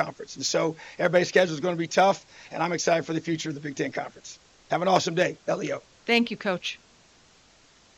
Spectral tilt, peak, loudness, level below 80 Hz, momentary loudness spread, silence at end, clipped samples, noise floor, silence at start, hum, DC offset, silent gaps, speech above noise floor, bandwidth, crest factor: -4 dB/octave; -6 dBFS; -26 LUFS; -68 dBFS; 12 LU; 1.2 s; under 0.1%; -58 dBFS; 0 s; none; under 0.1%; none; 32 dB; 13 kHz; 20 dB